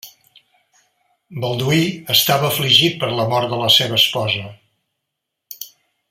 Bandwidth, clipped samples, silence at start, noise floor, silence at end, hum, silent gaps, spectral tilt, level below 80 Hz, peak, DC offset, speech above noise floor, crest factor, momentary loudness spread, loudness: 16.5 kHz; under 0.1%; 0.05 s; -79 dBFS; 0.45 s; none; none; -3.5 dB/octave; -58 dBFS; 0 dBFS; under 0.1%; 62 dB; 20 dB; 21 LU; -15 LUFS